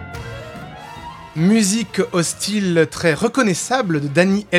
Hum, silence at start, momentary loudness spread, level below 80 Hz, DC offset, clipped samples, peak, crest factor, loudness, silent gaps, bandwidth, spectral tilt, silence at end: none; 0 s; 18 LU; -48 dBFS; under 0.1%; under 0.1%; -2 dBFS; 18 dB; -17 LUFS; none; 15.5 kHz; -4.5 dB/octave; 0 s